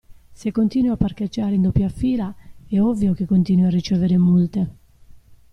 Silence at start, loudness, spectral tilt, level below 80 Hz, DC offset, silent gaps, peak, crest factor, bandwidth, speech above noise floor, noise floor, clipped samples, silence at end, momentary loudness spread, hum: 0.1 s; -20 LUFS; -9 dB/octave; -40 dBFS; under 0.1%; none; -4 dBFS; 14 dB; 6.6 kHz; 27 dB; -46 dBFS; under 0.1%; 0.2 s; 9 LU; none